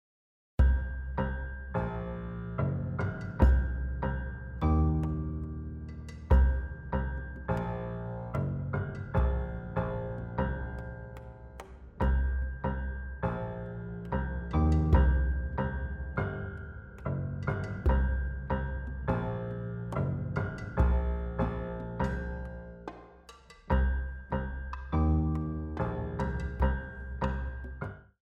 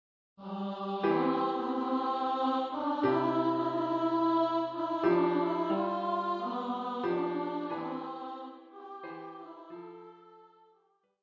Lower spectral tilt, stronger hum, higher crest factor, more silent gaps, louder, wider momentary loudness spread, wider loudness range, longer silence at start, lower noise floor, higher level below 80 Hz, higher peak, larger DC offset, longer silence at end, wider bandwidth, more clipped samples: first, -9.5 dB/octave vs -8 dB/octave; neither; about the same, 20 dB vs 16 dB; neither; about the same, -33 LUFS vs -31 LUFS; second, 13 LU vs 19 LU; second, 4 LU vs 11 LU; first, 0.6 s vs 0.4 s; second, -54 dBFS vs -71 dBFS; first, -34 dBFS vs -76 dBFS; first, -10 dBFS vs -16 dBFS; neither; second, 0.2 s vs 0.75 s; second, 4.8 kHz vs 7 kHz; neither